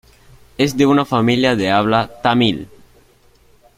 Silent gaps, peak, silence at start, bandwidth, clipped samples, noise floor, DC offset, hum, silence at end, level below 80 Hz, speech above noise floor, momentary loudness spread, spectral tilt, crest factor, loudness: none; 0 dBFS; 0.6 s; 15.5 kHz; under 0.1%; -51 dBFS; under 0.1%; none; 1.1 s; -48 dBFS; 36 dB; 5 LU; -5.5 dB/octave; 18 dB; -15 LUFS